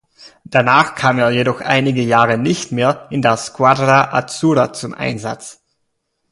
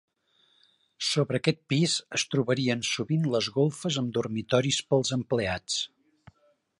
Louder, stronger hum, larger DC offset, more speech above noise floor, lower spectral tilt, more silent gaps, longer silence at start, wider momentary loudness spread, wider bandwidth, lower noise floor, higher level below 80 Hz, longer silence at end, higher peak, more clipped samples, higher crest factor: first, -15 LUFS vs -27 LUFS; neither; neither; first, 55 dB vs 40 dB; about the same, -5 dB/octave vs -4.5 dB/octave; neither; second, 0.25 s vs 1 s; first, 10 LU vs 4 LU; about the same, 11.5 kHz vs 11.5 kHz; about the same, -70 dBFS vs -68 dBFS; first, -54 dBFS vs -60 dBFS; second, 0.8 s vs 0.95 s; first, 0 dBFS vs -8 dBFS; neither; second, 16 dB vs 22 dB